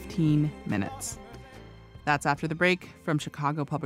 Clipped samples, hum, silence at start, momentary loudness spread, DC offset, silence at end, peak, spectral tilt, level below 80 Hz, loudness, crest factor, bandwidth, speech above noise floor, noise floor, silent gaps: under 0.1%; none; 0 s; 21 LU; under 0.1%; 0 s; -10 dBFS; -5.5 dB/octave; -54 dBFS; -28 LUFS; 20 dB; 15 kHz; 20 dB; -48 dBFS; none